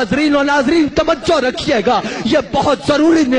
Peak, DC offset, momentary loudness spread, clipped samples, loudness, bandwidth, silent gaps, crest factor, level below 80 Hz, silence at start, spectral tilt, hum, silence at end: -2 dBFS; under 0.1%; 4 LU; under 0.1%; -14 LUFS; 10 kHz; none; 12 dB; -38 dBFS; 0 s; -5 dB/octave; none; 0 s